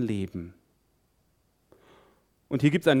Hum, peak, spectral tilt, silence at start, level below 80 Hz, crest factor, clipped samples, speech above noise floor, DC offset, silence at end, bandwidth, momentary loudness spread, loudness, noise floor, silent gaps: none; -8 dBFS; -7 dB/octave; 0 s; -62 dBFS; 22 dB; under 0.1%; 44 dB; under 0.1%; 0 s; 15.5 kHz; 19 LU; -26 LUFS; -69 dBFS; none